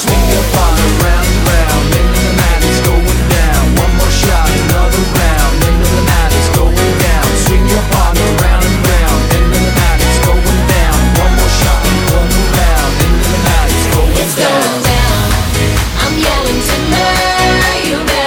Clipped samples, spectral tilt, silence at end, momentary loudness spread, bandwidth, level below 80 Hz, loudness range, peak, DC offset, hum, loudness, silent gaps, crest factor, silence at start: under 0.1%; -4.5 dB/octave; 0 s; 1 LU; 18 kHz; -12 dBFS; 1 LU; 0 dBFS; under 0.1%; none; -11 LUFS; none; 10 dB; 0 s